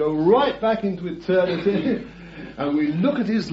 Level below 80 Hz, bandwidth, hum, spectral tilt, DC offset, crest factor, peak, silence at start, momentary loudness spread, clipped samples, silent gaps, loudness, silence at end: -52 dBFS; 7.8 kHz; none; -8 dB/octave; under 0.1%; 16 dB; -6 dBFS; 0 s; 11 LU; under 0.1%; none; -22 LUFS; 0 s